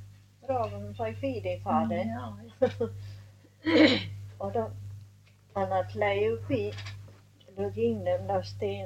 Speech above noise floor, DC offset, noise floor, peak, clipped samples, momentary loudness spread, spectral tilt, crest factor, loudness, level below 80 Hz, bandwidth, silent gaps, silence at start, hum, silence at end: 27 dB; under 0.1%; -57 dBFS; -8 dBFS; under 0.1%; 18 LU; -6.5 dB/octave; 22 dB; -30 LUFS; -62 dBFS; 11.5 kHz; none; 0 s; 50 Hz at -45 dBFS; 0 s